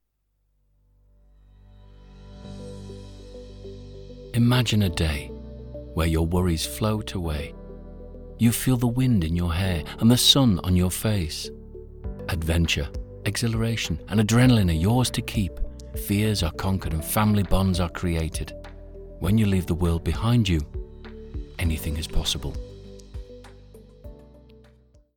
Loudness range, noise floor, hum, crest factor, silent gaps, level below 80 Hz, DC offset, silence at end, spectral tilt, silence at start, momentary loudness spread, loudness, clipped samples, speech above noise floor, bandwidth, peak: 10 LU; -72 dBFS; none; 22 dB; none; -36 dBFS; under 0.1%; 0.95 s; -5 dB/octave; 2.1 s; 22 LU; -24 LUFS; under 0.1%; 49 dB; 19 kHz; -4 dBFS